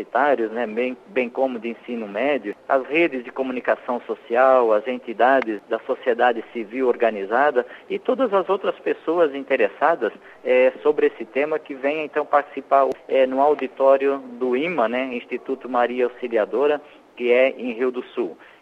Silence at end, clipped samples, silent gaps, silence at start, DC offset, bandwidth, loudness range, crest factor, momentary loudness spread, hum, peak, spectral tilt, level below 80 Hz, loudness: 0.3 s; under 0.1%; none; 0 s; under 0.1%; 6 kHz; 3 LU; 18 dB; 10 LU; none; -4 dBFS; -6.5 dB/octave; -72 dBFS; -21 LUFS